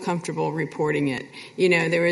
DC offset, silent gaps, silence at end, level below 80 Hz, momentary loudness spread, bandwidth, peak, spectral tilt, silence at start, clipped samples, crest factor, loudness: under 0.1%; none; 0 s; -66 dBFS; 9 LU; 11.5 kHz; -8 dBFS; -6 dB/octave; 0 s; under 0.1%; 16 dB; -23 LUFS